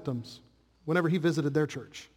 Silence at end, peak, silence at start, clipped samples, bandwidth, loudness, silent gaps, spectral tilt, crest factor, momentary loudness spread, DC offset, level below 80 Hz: 0.1 s; -14 dBFS; 0 s; under 0.1%; 16 kHz; -29 LUFS; none; -6.5 dB/octave; 18 dB; 15 LU; under 0.1%; -68 dBFS